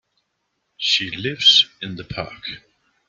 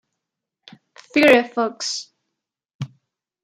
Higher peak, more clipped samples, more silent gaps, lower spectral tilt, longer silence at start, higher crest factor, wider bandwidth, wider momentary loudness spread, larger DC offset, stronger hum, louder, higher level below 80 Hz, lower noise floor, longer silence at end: about the same, -2 dBFS vs -2 dBFS; neither; second, none vs 2.75-2.79 s; second, -2 dB/octave vs -3.5 dB/octave; second, 0.8 s vs 1.15 s; about the same, 22 dB vs 22 dB; second, 13 kHz vs 15.5 kHz; about the same, 20 LU vs 21 LU; neither; neither; about the same, -16 LUFS vs -18 LUFS; first, -56 dBFS vs -68 dBFS; second, -73 dBFS vs -82 dBFS; about the same, 0.5 s vs 0.55 s